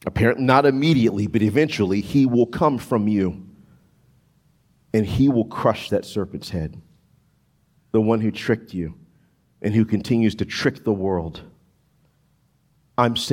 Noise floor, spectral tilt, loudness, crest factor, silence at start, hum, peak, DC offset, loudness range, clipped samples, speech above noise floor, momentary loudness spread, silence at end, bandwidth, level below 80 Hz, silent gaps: -63 dBFS; -7 dB/octave; -21 LUFS; 20 dB; 0.05 s; none; -2 dBFS; under 0.1%; 6 LU; under 0.1%; 43 dB; 12 LU; 0 s; 16 kHz; -50 dBFS; none